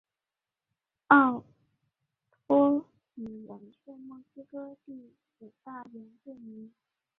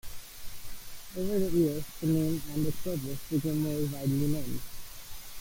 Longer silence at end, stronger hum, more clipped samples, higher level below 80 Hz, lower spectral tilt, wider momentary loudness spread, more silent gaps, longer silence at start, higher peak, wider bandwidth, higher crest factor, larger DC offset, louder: first, 0.55 s vs 0 s; neither; neither; second, -78 dBFS vs -48 dBFS; first, -9 dB/octave vs -6.5 dB/octave; first, 28 LU vs 17 LU; neither; first, 1.1 s vs 0.05 s; first, -6 dBFS vs -16 dBFS; second, 4 kHz vs 17 kHz; first, 26 dB vs 14 dB; neither; first, -24 LUFS vs -31 LUFS